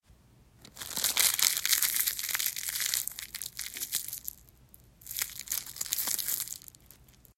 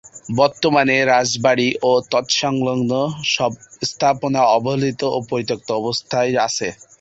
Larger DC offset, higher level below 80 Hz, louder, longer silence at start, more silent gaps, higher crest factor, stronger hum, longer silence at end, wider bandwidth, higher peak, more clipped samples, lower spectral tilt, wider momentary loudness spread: neither; second, -64 dBFS vs -56 dBFS; second, -29 LUFS vs -18 LUFS; first, 0.6 s vs 0.05 s; neither; first, 30 dB vs 16 dB; neither; first, 0.45 s vs 0.25 s; first, 16.5 kHz vs 8 kHz; about the same, -4 dBFS vs -2 dBFS; neither; second, 2 dB/octave vs -4 dB/octave; first, 14 LU vs 8 LU